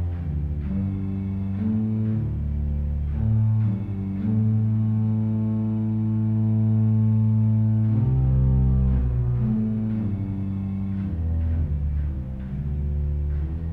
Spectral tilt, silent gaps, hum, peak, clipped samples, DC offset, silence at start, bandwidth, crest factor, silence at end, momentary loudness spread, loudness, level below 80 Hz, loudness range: -12.5 dB/octave; none; none; -12 dBFS; under 0.1%; under 0.1%; 0 s; 2.8 kHz; 10 dB; 0 s; 7 LU; -24 LUFS; -30 dBFS; 6 LU